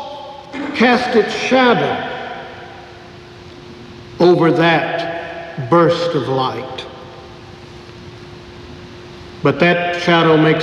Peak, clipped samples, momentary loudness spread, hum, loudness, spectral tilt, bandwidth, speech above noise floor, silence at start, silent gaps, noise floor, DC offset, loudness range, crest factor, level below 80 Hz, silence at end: -2 dBFS; under 0.1%; 24 LU; none; -15 LUFS; -6 dB/octave; 10.5 kHz; 23 dB; 0 s; none; -37 dBFS; under 0.1%; 7 LU; 16 dB; -50 dBFS; 0 s